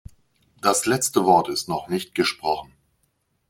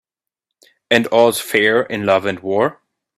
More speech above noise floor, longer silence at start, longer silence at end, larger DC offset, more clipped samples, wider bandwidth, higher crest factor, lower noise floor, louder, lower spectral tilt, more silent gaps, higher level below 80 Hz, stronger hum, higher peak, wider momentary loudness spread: second, 48 dB vs 67 dB; second, 0.65 s vs 0.9 s; first, 0.85 s vs 0.45 s; neither; neither; about the same, 16.5 kHz vs 15.5 kHz; about the same, 20 dB vs 18 dB; second, -70 dBFS vs -82 dBFS; second, -22 LUFS vs -16 LUFS; about the same, -3.5 dB/octave vs -4 dB/octave; neither; about the same, -58 dBFS vs -60 dBFS; neither; second, -4 dBFS vs 0 dBFS; first, 9 LU vs 5 LU